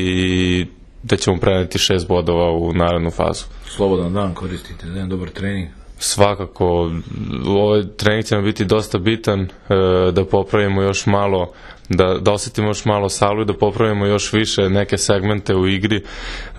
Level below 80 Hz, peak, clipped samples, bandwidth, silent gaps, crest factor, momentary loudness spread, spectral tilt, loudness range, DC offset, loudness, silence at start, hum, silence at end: -36 dBFS; 0 dBFS; under 0.1%; 13.5 kHz; none; 18 dB; 9 LU; -5 dB/octave; 4 LU; under 0.1%; -18 LUFS; 0 s; none; 0 s